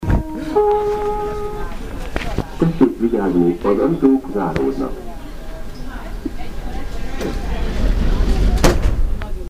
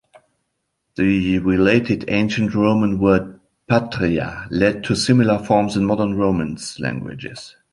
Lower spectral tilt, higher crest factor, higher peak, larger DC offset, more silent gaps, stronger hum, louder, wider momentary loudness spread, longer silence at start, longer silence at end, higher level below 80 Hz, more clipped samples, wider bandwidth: about the same, -7 dB/octave vs -6.5 dB/octave; about the same, 16 dB vs 18 dB; about the same, 0 dBFS vs -2 dBFS; first, 0.4% vs under 0.1%; neither; neither; about the same, -20 LUFS vs -18 LUFS; first, 16 LU vs 12 LU; second, 0 s vs 1 s; second, 0 s vs 0.25 s; first, -22 dBFS vs -44 dBFS; neither; first, 15.5 kHz vs 11.5 kHz